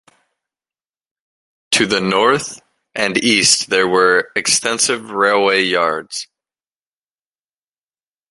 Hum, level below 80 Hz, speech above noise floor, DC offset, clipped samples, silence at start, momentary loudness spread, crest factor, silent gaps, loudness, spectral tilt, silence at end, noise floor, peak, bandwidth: none; -60 dBFS; over 74 dB; under 0.1%; under 0.1%; 1.7 s; 13 LU; 18 dB; none; -14 LUFS; -2 dB/octave; 2.05 s; under -90 dBFS; 0 dBFS; 11.5 kHz